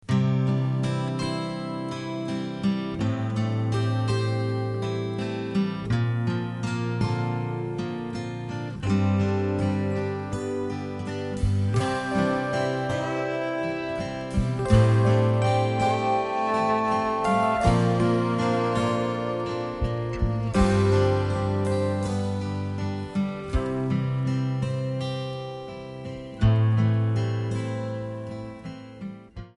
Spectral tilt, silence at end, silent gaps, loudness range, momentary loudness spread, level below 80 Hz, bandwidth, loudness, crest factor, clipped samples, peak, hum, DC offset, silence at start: -7.5 dB/octave; 0.05 s; none; 5 LU; 10 LU; -40 dBFS; 11.5 kHz; -26 LUFS; 18 dB; under 0.1%; -6 dBFS; none; under 0.1%; 0.05 s